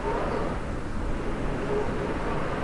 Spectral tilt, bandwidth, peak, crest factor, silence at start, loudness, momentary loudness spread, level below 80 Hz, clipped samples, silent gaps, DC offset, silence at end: -7 dB/octave; 11.5 kHz; -16 dBFS; 12 dB; 0 s; -30 LUFS; 4 LU; -34 dBFS; under 0.1%; none; under 0.1%; 0 s